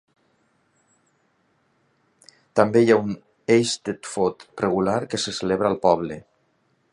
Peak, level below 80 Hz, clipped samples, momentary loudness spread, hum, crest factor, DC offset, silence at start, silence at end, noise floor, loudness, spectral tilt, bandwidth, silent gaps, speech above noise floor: 0 dBFS; -58 dBFS; under 0.1%; 12 LU; none; 24 dB; under 0.1%; 2.55 s; 0.75 s; -67 dBFS; -22 LUFS; -5 dB/octave; 11.5 kHz; none; 46 dB